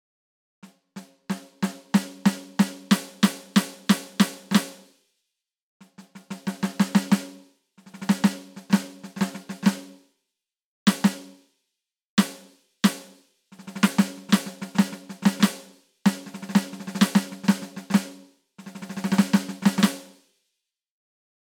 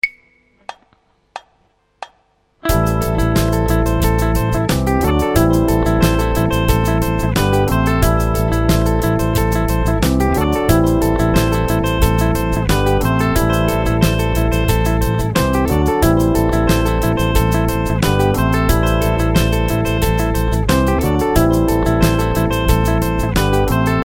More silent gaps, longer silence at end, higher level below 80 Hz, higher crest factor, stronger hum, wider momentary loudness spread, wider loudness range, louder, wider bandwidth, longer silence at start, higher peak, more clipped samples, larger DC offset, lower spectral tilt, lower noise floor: first, 5.62-5.80 s, 10.64-10.86 s, 12.05-12.17 s vs none; first, 1.5 s vs 0 s; second, -74 dBFS vs -22 dBFS; first, 22 dB vs 14 dB; neither; first, 18 LU vs 3 LU; about the same, 4 LU vs 2 LU; second, -25 LUFS vs -16 LUFS; first, 19.5 kHz vs 17.5 kHz; first, 0.95 s vs 0.05 s; second, -4 dBFS vs 0 dBFS; neither; neither; about the same, -5 dB/octave vs -6 dB/octave; first, -85 dBFS vs -59 dBFS